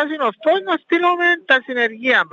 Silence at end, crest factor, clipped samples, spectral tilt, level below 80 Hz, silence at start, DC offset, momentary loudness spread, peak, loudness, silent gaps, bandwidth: 0.05 s; 14 dB; under 0.1%; -4 dB/octave; -82 dBFS; 0 s; under 0.1%; 4 LU; -2 dBFS; -17 LUFS; none; 7.4 kHz